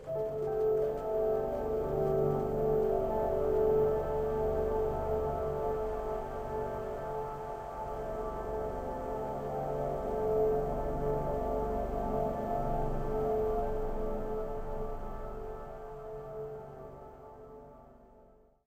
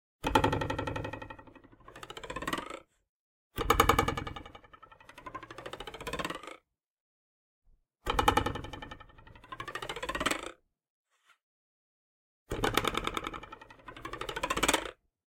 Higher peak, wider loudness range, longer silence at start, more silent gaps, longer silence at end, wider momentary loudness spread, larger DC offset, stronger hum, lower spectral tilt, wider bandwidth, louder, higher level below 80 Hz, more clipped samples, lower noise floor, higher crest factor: second, -18 dBFS vs -8 dBFS; first, 10 LU vs 7 LU; second, 0 s vs 0.2 s; second, none vs 3.09-3.50 s, 6.87-7.62 s, 10.90-11.05 s, 11.43-12.46 s; about the same, 0.45 s vs 0.4 s; second, 14 LU vs 21 LU; neither; neither; first, -8.5 dB/octave vs -3.5 dB/octave; about the same, 16 kHz vs 17 kHz; about the same, -34 LUFS vs -32 LUFS; first, -42 dBFS vs -48 dBFS; neither; about the same, -61 dBFS vs -60 dBFS; second, 14 dB vs 28 dB